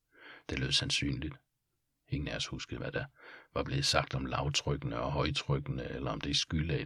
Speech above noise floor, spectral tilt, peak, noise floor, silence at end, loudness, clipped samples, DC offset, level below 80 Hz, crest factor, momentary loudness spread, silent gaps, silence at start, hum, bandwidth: 47 dB; -4 dB/octave; -10 dBFS; -82 dBFS; 0 s; -34 LUFS; under 0.1%; under 0.1%; -48 dBFS; 24 dB; 12 LU; none; 0.2 s; none; 13.5 kHz